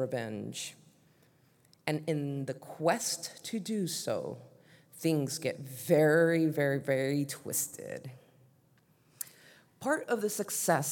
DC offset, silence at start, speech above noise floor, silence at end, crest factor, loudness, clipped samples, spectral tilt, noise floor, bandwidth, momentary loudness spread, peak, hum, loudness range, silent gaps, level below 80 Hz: under 0.1%; 0 s; 35 dB; 0 s; 20 dB; -32 LUFS; under 0.1%; -4.5 dB/octave; -67 dBFS; 18 kHz; 16 LU; -12 dBFS; none; 7 LU; none; -84 dBFS